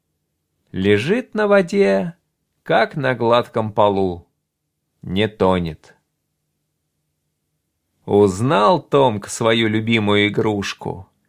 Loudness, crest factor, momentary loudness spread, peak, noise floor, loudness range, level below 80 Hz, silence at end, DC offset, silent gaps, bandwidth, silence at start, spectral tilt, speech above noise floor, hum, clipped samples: -17 LUFS; 18 dB; 11 LU; -2 dBFS; -75 dBFS; 8 LU; -46 dBFS; 0.25 s; under 0.1%; none; 15 kHz; 0.75 s; -5.5 dB/octave; 58 dB; none; under 0.1%